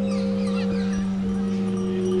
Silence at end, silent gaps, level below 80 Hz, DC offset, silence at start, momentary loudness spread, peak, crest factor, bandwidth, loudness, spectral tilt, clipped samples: 0 s; none; -46 dBFS; under 0.1%; 0 s; 1 LU; -14 dBFS; 10 dB; 10.5 kHz; -25 LUFS; -7.5 dB/octave; under 0.1%